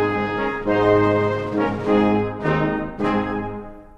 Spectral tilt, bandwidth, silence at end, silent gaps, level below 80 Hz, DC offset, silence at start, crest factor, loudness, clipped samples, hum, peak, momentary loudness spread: -8 dB/octave; 8 kHz; 0.1 s; none; -42 dBFS; under 0.1%; 0 s; 16 dB; -20 LUFS; under 0.1%; none; -4 dBFS; 8 LU